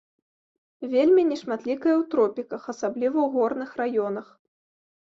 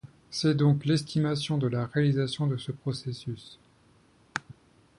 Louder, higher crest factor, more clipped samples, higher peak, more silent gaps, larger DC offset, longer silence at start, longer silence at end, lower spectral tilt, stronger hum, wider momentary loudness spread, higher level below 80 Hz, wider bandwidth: first, -24 LUFS vs -29 LUFS; about the same, 14 dB vs 18 dB; neither; about the same, -10 dBFS vs -10 dBFS; neither; neither; first, 0.8 s vs 0.05 s; first, 0.85 s vs 0.45 s; about the same, -6 dB/octave vs -6.5 dB/octave; neither; about the same, 13 LU vs 14 LU; second, -72 dBFS vs -62 dBFS; second, 7.6 kHz vs 11.5 kHz